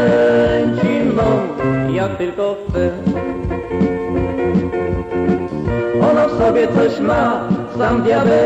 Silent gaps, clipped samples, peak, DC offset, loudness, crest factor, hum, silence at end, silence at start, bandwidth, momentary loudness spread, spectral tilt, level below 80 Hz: none; under 0.1%; -6 dBFS; under 0.1%; -16 LUFS; 10 dB; none; 0 s; 0 s; 8.4 kHz; 7 LU; -8 dB/octave; -34 dBFS